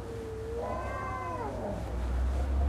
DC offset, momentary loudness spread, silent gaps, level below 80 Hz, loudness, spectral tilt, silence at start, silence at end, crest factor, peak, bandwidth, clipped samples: under 0.1%; 5 LU; none; -36 dBFS; -35 LUFS; -7.5 dB/octave; 0 s; 0 s; 12 dB; -20 dBFS; 11 kHz; under 0.1%